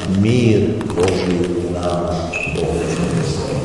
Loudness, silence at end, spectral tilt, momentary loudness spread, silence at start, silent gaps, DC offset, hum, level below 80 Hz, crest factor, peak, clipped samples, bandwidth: -18 LUFS; 0 s; -6.5 dB/octave; 6 LU; 0 s; none; 0.4%; none; -38 dBFS; 16 dB; -2 dBFS; under 0.1%; 11.5 kHz